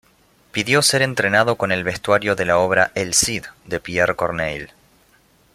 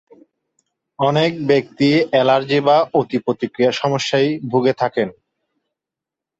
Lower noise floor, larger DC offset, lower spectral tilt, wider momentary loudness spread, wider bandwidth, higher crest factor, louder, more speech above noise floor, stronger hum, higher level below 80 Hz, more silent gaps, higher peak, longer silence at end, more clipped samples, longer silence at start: second, -56 dBFS vs -86 dBFS; neither; second, -3 dB/octave vs -6 dB/octave; first, 13 LU vs 6 LU; first, 16 kHz vs 8 kHz; about the same, 18 dB vs 16 dB; about the same, -18 LUFS vs -17 LUFS; second, 37 dB vs 69 dB; neither; first, -50 dBFS vs -60 dBFS; neither; about the same, -2 dBFS vs -2 dBFS; second, 0.9 s vs 1.3 s; neither; second, 0.55 s vs 1 s